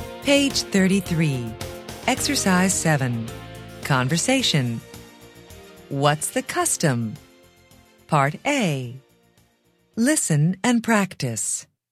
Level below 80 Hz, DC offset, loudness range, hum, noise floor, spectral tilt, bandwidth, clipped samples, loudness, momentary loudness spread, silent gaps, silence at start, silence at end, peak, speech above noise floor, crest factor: -50 dBFS; under 0.1%; 4 LU; none; -63 dBFS; -4 dB/octave; 16 kHz; under 0.1%; -21 LUFS; 15 LU; none; 0 s; 0.3 s; -4 dBFS; 42 dB; 20 dB